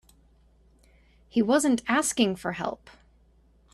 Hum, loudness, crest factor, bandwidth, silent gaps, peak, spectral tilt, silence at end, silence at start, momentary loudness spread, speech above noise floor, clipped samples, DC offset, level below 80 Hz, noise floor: none; -26 LUFS; 20 dB; 14 kHz; none; -10 dBFS; -3.5 dB/octave; 1 s; 1.35 s; 11 LU; 35 dB; under 0.1%; under 0.1%; -60 dBFS; -60 dBFS